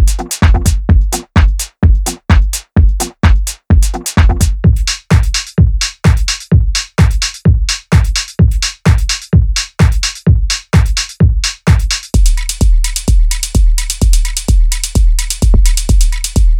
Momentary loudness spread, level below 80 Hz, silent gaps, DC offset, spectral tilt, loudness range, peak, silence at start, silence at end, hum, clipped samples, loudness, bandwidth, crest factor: 3 LU; -12 dBFS; none; under 0.1%; -4.5 dB/octave; 1 LU; 0 dBFS; 0 s; 0 s; none; under 0.1%; -13 LUFS; 16 kHz; 10 dB